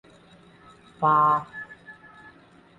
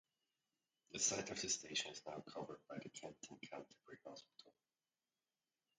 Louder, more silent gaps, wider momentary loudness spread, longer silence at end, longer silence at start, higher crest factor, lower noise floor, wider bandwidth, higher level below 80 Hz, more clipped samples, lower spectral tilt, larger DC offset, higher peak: first, -22 LUFS vs -45 LUFS; neither; first, 26 LU vs 20 LU; second, 0.85 s vs 1.3 s; about the same, 1 s vs 0.9 s; second, 18 dB vs 26 dB; second, -53 dBFS vs under -90 dBFS; about the same, 9.2 kHz vs 9.4 kHz; first, -64 dBFS vs -82 dBFS; neither; first, -7.5 dB/octave vs -1 dB/octave; neither; first, -10 dBFS vs -24 dBFS